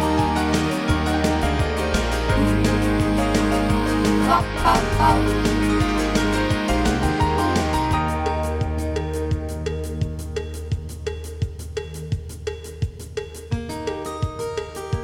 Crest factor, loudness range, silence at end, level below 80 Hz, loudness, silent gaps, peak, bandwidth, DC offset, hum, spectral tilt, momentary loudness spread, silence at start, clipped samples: 16 dB; 10 LU; 0 s; -28 dBFS; -22 LUFS; none; -4 dBFS; 16.5 kHz; under 0.1%; none; -5.5 dB/octave; 11 LU; 0 s; under 0.1%